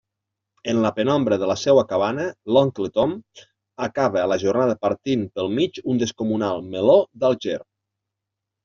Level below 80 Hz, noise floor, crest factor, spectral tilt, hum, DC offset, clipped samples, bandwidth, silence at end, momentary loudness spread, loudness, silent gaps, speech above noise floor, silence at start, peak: -60 dBFS; -84 dBFS; 18 dB; -5 dB/octave; none; under 0.1%; under 0.1%; 7.4 kHz; 1 s; 9 LU; -21 LUFS; none; 63 dB; 0.65 s; -4 dBFS